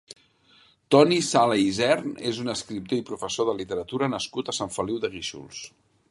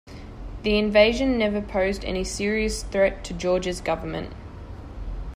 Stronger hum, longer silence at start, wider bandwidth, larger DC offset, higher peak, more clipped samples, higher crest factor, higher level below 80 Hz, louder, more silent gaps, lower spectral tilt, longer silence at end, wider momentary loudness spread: neither; first, 0.9 s vs 0.05 s; second, 11.5 kHz vs 15 kHz; neither; about the same, -4 dBFS vs -4 dBFS; neither; about the same, 22 dB vs 20 dB; second, -60 dBFS vs -36 dBFS; about the same, -25 LUFS vs -23 LUFS; neither; about the same, -4.5 dB/octave vs -4.5 dB/octave; first, 0.45 s vs 0 s; second, 14 LU vs 21 LU